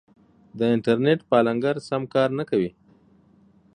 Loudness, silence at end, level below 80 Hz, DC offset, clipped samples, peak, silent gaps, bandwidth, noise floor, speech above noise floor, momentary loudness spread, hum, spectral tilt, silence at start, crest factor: -23 LUFS; 1.1 s; -64 dBFS; under 0.1%; under 0.1%; -4 dBFS; none; 10 kHz; -57 dBFS; 35 dB; 6 LU; none; -7.5 dB/octave; 0.55 s; 20 dB